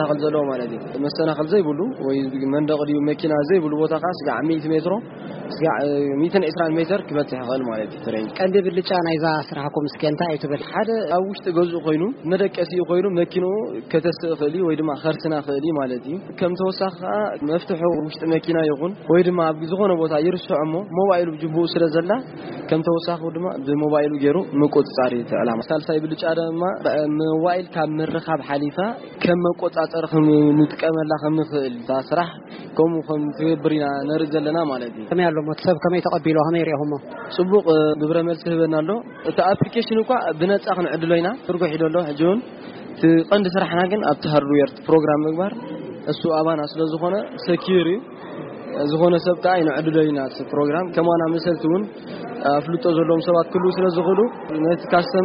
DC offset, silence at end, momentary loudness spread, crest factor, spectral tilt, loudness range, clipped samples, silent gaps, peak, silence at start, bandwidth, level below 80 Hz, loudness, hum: under 0.1%; 0 s; 7 LU; 16 dB; -5.5 dB/octave; 3 LU; under 0.1%; none; -4 dBFS; 0 s; 5.4 kHz; -62 dBFS; -21 LUFS; none